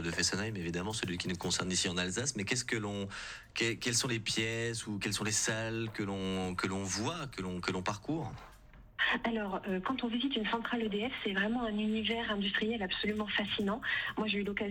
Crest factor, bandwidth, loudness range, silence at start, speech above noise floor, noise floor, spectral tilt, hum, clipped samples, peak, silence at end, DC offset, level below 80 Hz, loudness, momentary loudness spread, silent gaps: 18 dB; 17.5 kHz; 3 LU; 0 s; 21 dB; -56 dBFS; -3.5 dB/octave; none; under 0.1%; -16 dBFS; 0 s; under 0.1%; -60 dBFS; -34 LUFS; 6 LU; none